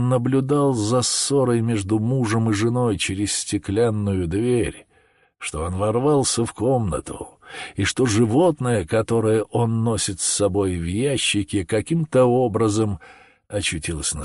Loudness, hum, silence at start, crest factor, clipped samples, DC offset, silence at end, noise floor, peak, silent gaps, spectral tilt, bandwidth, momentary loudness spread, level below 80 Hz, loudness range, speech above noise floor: -21 LUFS; none; 0 s; 14 dB; under 0.1%; under 0.1%; 0 s; -59 dBFS; -8 dBFS; none; -5 dB/octave; 11.5 kHz; 8 LU; -42 dBFS; 3 LU; 39 dB